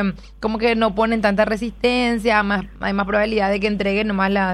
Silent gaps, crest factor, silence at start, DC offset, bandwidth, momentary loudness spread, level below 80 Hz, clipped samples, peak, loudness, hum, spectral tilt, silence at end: none; 16 dB; 0 s; under 0.1%; 12 kHz; 5 LU; -38 dBFS; under 0.1%; -4 dBFS; -19 LUFS; none; -6 dB/octave; 0 s